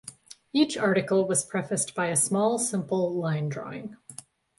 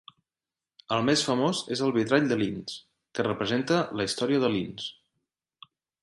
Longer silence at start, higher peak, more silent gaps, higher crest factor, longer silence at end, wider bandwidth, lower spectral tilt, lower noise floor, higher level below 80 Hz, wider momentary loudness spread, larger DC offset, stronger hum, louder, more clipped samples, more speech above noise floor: second, 0.05 s vs 0.9 s; about the same, -10 dBFS vs -8 dBFS; neither; about the same, 18 dB vs 20 dB; second, 0.45 s vs 1.1 s; about the same, 12 kHz vs 11.5 kHz; about the same, -4.5 dB/octave vs -4.5 dB/octave; second, -48 dBFS vs under -90 dBFS; second, -70 dBFS vs -64 dBFS; first, 17 LU vs 14 LU; neither; neither; about the same, -26 LUFS vs -27 LUFS; neither; second, 22 dB vs over 64 dB